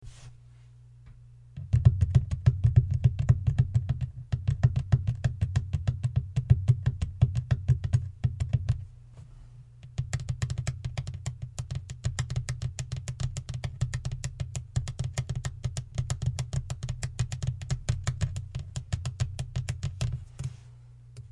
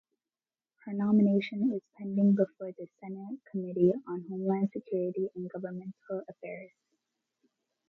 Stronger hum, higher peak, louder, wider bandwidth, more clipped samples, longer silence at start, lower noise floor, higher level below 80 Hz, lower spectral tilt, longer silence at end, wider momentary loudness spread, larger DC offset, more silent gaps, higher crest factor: neither; first, -6 dBFS vs -14 dBFS; about the same, -30 LUFS vs -31 LUFS; first, 11.5 kHz vs 4.3 kHz; neither; second, 0 s vs 0.85 s; second, -52 dBFS vs under -90 dBFS; first, -40 dBFS vs -78 dBFS; second, -6.5 dB/octave vs -10.5 dB/octave; second, 0.05 s vs 1.2 s; second, 13 LU vs 17 LU; neither; neither; about the same, 22 dB vs 18 dB